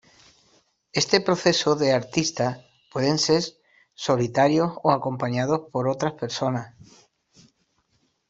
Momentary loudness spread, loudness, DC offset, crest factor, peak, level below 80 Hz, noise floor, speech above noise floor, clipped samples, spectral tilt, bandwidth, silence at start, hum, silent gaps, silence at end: 10 LU; -23 LUFS; under 0.1%; 22 dB; -4 dBFS; -62 dBFS; -69 dBFS; 46 dB; under 0.1%; -4.5 dB/octave; 8.2 kHz; 0.95 s; none; none; 1.6 s